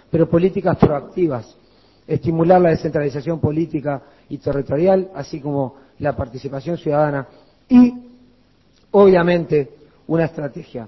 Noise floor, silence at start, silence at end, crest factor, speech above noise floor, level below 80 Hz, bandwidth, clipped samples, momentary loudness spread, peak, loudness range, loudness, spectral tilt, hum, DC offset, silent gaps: -56 dBFS; 0.15 s; 0 s; 18 dB; 38 dB; -44 dBFS; 6 kHz; under 0.1%; 15 LU; 0 dBFS; 5 LU; -18 LUFS; -9.5 dB/octave; none; under 0.1%; none